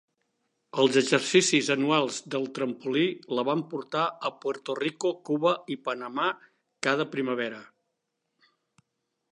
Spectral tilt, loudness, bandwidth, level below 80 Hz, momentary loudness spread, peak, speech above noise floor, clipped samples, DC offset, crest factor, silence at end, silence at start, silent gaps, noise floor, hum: -3.5 dB/octave; -27 LUFS; 11.5 kHz; -78 dBFS; 11 LU; -6 dBFS; 54 dB; under 0.1%; under 0.1%; 22 dB; 1.7 s; 0.75 s; none; -81 dBFS; none